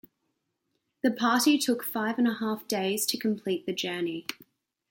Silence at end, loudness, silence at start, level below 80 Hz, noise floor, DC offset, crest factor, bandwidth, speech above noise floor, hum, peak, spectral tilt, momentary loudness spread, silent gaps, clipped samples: 0.55 s; -28 LUFS; 1.05 s; -78 dBFS; -79 dBFS; under 0.1%; 18 dB; 17 kHz; 51 dB; none; -12 dBFS; -3.5 dB/octave; 9 LU; none; under 0.1%